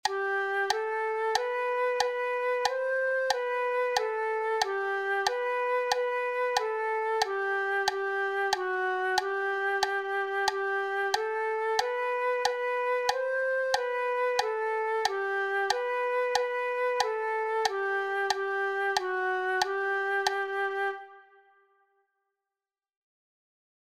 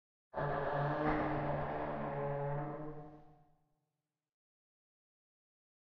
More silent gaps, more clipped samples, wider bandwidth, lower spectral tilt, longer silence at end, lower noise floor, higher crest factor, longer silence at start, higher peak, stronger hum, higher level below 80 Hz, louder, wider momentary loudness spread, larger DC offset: neither; neither; first, 16 kHz vs 5.6 kHz; second, -0.5 dB/octave vs -6.5 dB/octave; first, 2.7 s vs 2.5 s; about the same, under -90 dBFS vs under -90 dBFS; about the same, 18 dB vs 20 dB; second, 0.05 s vs 0.35 s; first, -10 dBFS vs -22 dBFS; neither; second, -72 dBFS vs -56 dBFS; first, -29 LUFS vs -38 LUFS; second, 2 LU vs 12 LU; neither